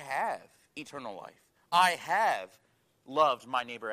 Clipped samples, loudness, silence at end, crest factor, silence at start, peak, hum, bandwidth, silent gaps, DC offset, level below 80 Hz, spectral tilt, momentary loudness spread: under 0.1%; -29 LUFS; 0 s; 20 dB; 0 s; -10 dBFS; none; 15.5 kHz; none; under 0.1%; -80 dBFS; -2.5 dB/octave; 20 LU